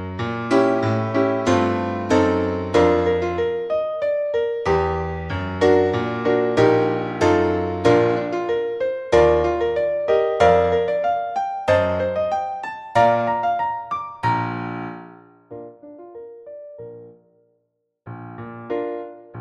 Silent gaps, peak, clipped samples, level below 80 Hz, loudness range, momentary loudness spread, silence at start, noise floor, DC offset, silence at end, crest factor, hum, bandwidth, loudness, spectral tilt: none; -2 dBFS; under 0.1%; -44 dBFS; 15 LU; 21 LU; 0 s; -72 dBFS; under 0.1%; 0 s; 20 dB; none; 10 kHz; -20 LUFS; -6.5 dB/octave